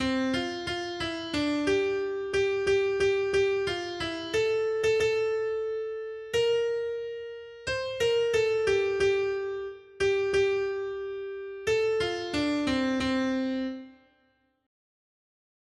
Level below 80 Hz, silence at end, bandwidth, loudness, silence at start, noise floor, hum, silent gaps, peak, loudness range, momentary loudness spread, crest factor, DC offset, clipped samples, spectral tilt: -56 dBFS; 1.75 s; 11.5 kHz; -28 LUFS; 0 s; -70 dBFS; none; none; -14 dBFS; 3 LU; 10 LU; 14 dB; under 0.1%; under 0.1%; -4.5 dB/octave